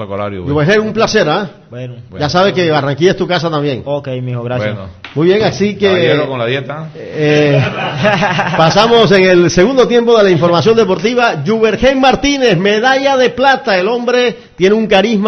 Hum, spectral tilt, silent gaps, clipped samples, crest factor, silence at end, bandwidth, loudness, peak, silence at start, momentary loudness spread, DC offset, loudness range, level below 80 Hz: none; -5.5 dB/octave; none; under 0.1%; 12 dB; 0 s; 6.6 kHz; -11 LUFS; 0 dBFS; 0 s; 11 LU; under 0.1%; 5 LU; -40 dBFS